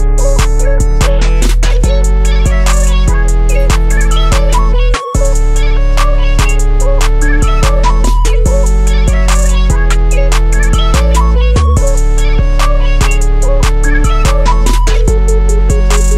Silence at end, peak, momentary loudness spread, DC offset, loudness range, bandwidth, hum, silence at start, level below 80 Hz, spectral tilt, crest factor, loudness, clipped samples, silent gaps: 0 s; 0 dBFS; 2 LU; under 0.1%; 1 LU; 12.5 kHz; none; 0 s; -8 dBFS; -5 dB/octave; 6 dB; -12 LUFS; under 0.1%; none